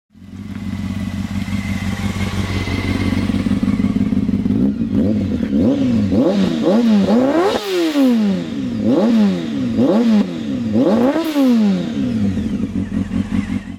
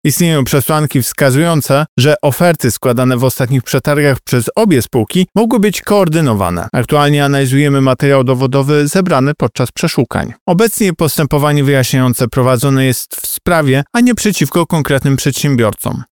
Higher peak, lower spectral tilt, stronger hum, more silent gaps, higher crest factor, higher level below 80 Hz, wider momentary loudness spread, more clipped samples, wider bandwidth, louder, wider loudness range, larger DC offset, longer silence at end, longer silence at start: second, -4 dBFS vs 0 dBFS; first, -7 dB/octave vs -5.5 dB/octave; neither; second, none vs 1.88-1.97 s, 10.41-10.46 s; about the same, 14 dB vs 12 dB; about the same, -36 dBFS vs -40 dBFS; first, 8 LU vs 4 LU; neither; second, 15.5 kHz vs 20 kHz; second, -17 LUFS vs -12 LUFS; first, 4 LU vs 1 LU; second, under 0.1% vs 0.5%; about the same, 0 s vs 0.1 s; first, 0.2 s vs 0.05 s